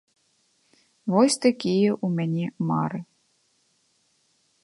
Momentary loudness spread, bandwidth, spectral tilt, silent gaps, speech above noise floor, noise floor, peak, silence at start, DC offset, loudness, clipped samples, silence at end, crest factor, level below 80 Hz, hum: 10 LU; 11.5 kHz; -5.5 dB/octave; none; 45 dB; -68 dBFS; -6 dBFS; 1.05 s; under 0.1%; -24 LUFS; under 0.1%; 1.6 s; 20 dB; -72 dBFS; none